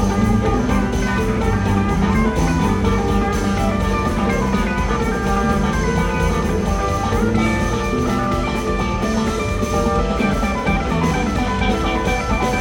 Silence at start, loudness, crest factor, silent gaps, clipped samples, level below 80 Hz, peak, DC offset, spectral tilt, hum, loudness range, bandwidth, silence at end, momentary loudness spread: 0 s; -19 LUFS; 14 dB; none; under 0.1%; -24 dBFS; -4 dBFS; under 0.1%; -6 dB/octave; none; 1 LU; 17.5 kHz; 0 s; 2 LU